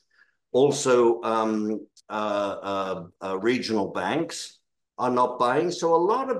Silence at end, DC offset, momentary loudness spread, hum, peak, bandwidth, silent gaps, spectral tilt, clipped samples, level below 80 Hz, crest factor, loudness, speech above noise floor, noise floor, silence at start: 0 s; under 0.1%; 12 LU; none; -8 dBFS; 12.5 kHz; none; -4.5 dB/octave; under 0.1%; -74 dBFS; 16 dB; -25 LUFS; 40 dB; -64 dBFS; 0.55 s